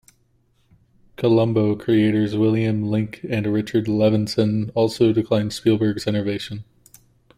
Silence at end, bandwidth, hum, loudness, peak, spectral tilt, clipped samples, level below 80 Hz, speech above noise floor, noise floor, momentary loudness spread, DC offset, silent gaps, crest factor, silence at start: 0.75 s; 14.5 kHz; none; -20 LUFS; -4 dBFS; -7 dB/octave; under 0.1%; -54 dBFS; 43 dB; -62 dBFS; 7 LU; under 0.1%; none; 16 dB; 1.2 s